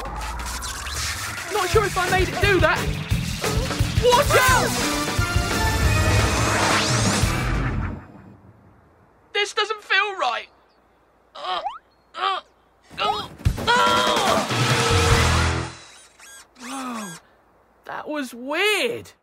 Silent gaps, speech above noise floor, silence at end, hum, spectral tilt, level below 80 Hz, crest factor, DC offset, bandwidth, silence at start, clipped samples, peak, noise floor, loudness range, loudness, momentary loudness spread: none; 39 dB; 0.15 s; none; -4 dB/octave; -32 dBFS; 18 dB; under 0.1%; 16 kHz; 0 s; under 0.1%; -4 dBFS; -58 dBFS; 8 LU; -21 LUFS; 14 LU